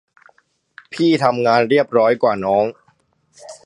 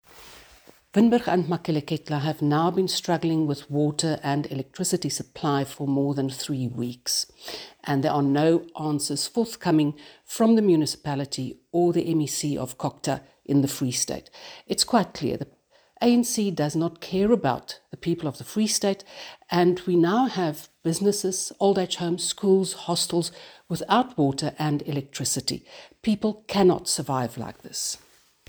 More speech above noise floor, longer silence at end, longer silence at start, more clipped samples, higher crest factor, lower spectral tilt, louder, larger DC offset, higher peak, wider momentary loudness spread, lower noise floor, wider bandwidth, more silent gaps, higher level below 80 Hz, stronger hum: first, 45 dB vs 29 dB; second, 0.1 s vs 0.5 s; first, 0.9 s vs 0.15 s; neither; about the same, 18 dB vs 18 dB; about the same, -6 dB/octave vs -5 dB/octave; first, -16 LUFS vs -25 LUFS; neither; first, 0 dBFS vs -6 dBFS; second, 5 LU vs 11 LU; first, -60 dBFS vs -54 dBFS; second, 11 kHz vs over 20 kHz; neither; about the same, -62 dBFS vs -60 dBFS; neither